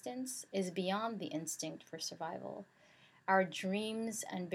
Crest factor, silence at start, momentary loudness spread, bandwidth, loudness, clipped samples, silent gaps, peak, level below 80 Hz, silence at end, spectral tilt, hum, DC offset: 22 dB; 0.05 s; 13 LU; 16 kHz; -39 LUFS; under 0.1%; none; -18 dBFS; under -90 dBFS; 0 s; -4 dB/octave; none; under 0.1%